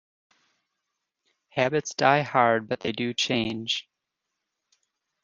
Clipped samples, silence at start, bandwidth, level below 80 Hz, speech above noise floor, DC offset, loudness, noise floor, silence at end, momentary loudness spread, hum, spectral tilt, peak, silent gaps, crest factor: under 0.1%; 1.55 s; 10 kHz; -66 dBFS; 59 dB; under 0.1%; -25 LUFS; -83 dBFS; 1.4 s; 8 LU; none; -4 dB/octave; -4 dBFS; none; 24 dB